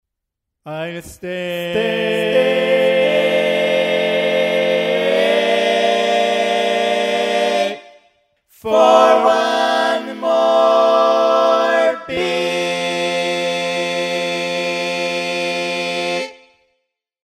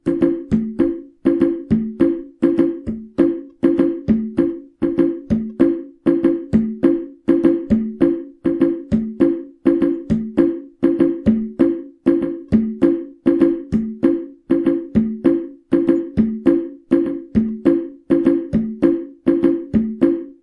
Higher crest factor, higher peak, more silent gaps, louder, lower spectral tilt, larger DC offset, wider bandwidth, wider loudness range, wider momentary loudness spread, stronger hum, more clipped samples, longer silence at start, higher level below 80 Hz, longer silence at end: about the same, 16 dB vs 16 dB; about the same, 0 dBFS vs 0 dBFS; neither; about the same, -16 LUFS vs -18 LUFS; second, -3.5 dB/octave vs -9.5 dB/octave; neither; first, 15 kHz vs 4.6 kHz; first, 5 LU vs 1 LU; first, 9 LU vs 5 LU; neither; neither; first, 0.65 s vs 0.05 s; second, -60 dBFS vs -44 dBFS; first, 0.9 s vs 0.1 s